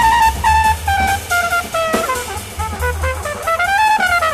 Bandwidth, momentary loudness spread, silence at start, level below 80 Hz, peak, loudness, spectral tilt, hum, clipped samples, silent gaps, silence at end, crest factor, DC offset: 15 kHz; 8 LU; 0 s; -28 dBFS; -2 dBFS; -16 LUFS; -3 dB/octave; none; under 0.1%; none; 0 s; 14 dB; under 0.1%